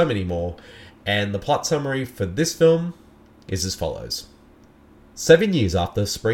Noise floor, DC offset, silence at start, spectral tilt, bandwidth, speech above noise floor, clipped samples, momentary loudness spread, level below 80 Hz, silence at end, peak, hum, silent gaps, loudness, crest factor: -51 dBFS; under 0.1%; 0 s; -5 dB/octave; 17 kHz; 30 dB; under 0.1%; 14 LU; -44 dBFS; 0 s; 0 dBFS; none; none; -22 LUFS; 22 dB